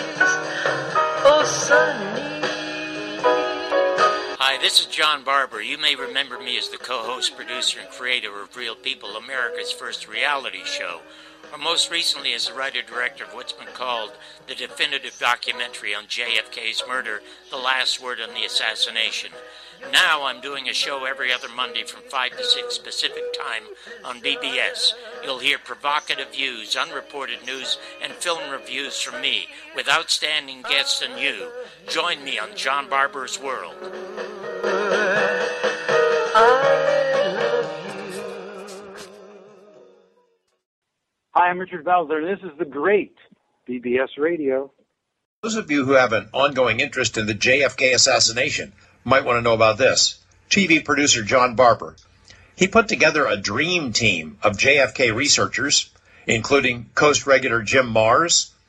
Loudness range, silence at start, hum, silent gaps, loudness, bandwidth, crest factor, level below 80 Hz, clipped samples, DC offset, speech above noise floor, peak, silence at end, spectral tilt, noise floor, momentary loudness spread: 8 LU; 0 s; none; 40.66-40.82 s, 45.25-45.43 s; -20 LUFS; 14 kHz; 20 dB; -56 dBFS; under 0.1%; under 0.1%; 56 dB; -2 dBFS; 0.2 s; -2 dB/octave; -78 dBFS; 15 LU